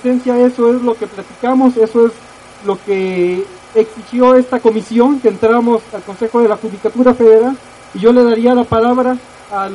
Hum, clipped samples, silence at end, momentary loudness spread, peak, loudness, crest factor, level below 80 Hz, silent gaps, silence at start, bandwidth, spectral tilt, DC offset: none; under 0.1%; 0 s; 12 LU; 0 dBFS; -12 LUFS; 12 dB; -48 dBFS; none; 0.05 s; 11 kHz; -7 dB/octave; under 0.1%